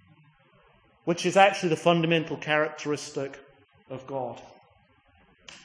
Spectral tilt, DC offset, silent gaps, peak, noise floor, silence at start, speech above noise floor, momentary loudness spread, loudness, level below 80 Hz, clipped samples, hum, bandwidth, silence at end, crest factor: -5 dB/octave; under 0.1%; none; -6 dBFS; -62 dBFS; 1.05 s; 36 dB; 18 LU; -26 LUFS; -72 dBFS; under 0.1%; none; 10.5 kHz; 0.05 s; 24 dB